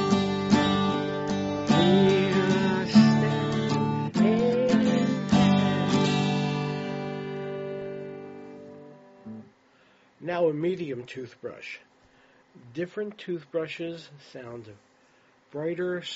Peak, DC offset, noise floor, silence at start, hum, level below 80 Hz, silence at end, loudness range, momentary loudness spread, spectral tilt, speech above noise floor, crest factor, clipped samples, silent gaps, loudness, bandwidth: -6 dBFS; under 0.1%; -61 dBFS; 0 s; none; -58 dBFS; 0 s; 14 LU; 22 LU; -5.5 dB/octave; 29 dB; 20 dB; under 0.1%; none; -25 LUFS; 8 kHz